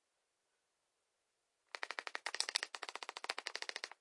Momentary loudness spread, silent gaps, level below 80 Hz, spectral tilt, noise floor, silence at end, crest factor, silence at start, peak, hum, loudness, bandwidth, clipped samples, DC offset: 9 LU; none; under -90 dBFS; 3.5 dB/octave; -85 dBFS; 0.1 s; 34 dB; 1.75 s; -12 dBFS; none; -43 LUFS; 11.5 kHz; under 0.1%; under 0.1%